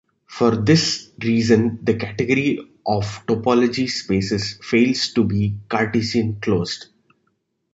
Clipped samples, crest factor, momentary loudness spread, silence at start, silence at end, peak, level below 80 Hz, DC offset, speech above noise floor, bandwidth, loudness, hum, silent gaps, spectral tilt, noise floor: under 0.1%; 18 dB; 7 LU; 0.3 s; 0.9 s; -2 dBFS; -48 dBFS; under 0.1%; 50 dB; 8 kHz; -20 LUFS; none; none; -5.5 dB/octave; -70 dBFS